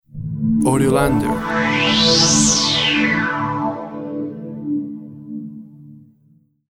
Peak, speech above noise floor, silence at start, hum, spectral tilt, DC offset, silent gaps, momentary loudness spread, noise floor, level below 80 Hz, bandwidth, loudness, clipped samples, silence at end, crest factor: -2 dBFS; 40 dB; 0.15 s; none; -3 dB/octave; under 0.1%; none; 19 LU; -55 dBFS; -40 dBFS; 16 kHz; -16 LUFS; under 0.1%; 0.7 s; 16 dB